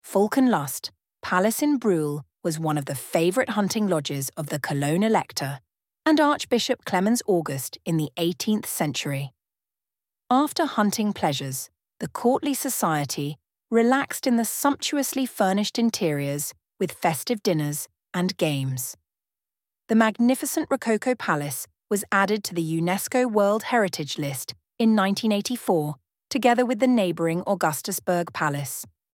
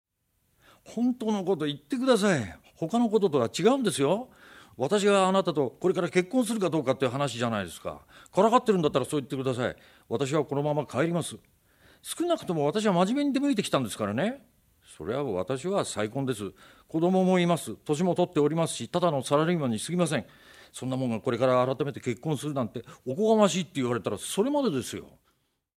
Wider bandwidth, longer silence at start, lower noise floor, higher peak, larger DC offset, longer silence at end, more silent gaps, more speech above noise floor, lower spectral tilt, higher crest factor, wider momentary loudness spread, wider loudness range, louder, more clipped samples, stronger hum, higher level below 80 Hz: second, 18 kHz vs over 20 kHz; second, 0.05 s vs 0.85 s; first, under -90 dBFS vs -73 dBFS; about the same, -6 dBFS vs -8 dBFS; neither; second, 0.25 s vs 0.75 s; neither; first, over 66 dB vs 47 dB; about the same, -4.5 dB/octave vs -5.5 dB/octave; about the same, 20 dB vs 20 dB; about the same, 10 LU vs 12 LU; about the same, 3 LU vs 4 LU; first, -24 LUFS vs -27 LUFS; neither; neither; about the same, -68 dBFS vs -66 dBFS